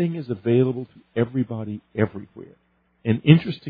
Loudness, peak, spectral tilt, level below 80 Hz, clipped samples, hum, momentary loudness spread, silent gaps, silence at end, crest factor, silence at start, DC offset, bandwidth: -23 LUFS; 0 dBFS; -11 dB/octave; -60 dBFS; under 0.1%; none; 15 LU; none; 0 s; 22 dB; 0 s; under 0.1%; 4.9 kHz